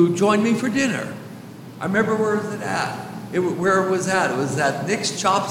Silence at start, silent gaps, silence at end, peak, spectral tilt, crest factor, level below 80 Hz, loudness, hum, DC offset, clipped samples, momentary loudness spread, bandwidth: 0 s; none; 0 s; -6 dBFS; -4.5 dB/octave; 16 dB; -62 dBFS; -21 LUFS; none; under 0.1%; under 0.1%; 14 LU; 16.5 kHz